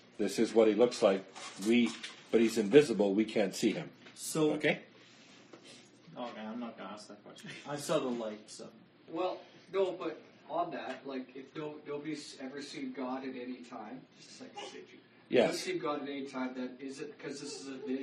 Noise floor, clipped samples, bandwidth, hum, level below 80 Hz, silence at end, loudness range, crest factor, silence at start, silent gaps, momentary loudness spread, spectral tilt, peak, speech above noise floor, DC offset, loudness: -58 dBFS; under 0.1%; 12.5 kHz; none; -82 dBFS; 0 s; 13 LU; 24 dB; 0.2 s; none; 21 LU; -4.5 dB/octave; -10 dBFS; 24 dB; under 0.1%; -34 LUFS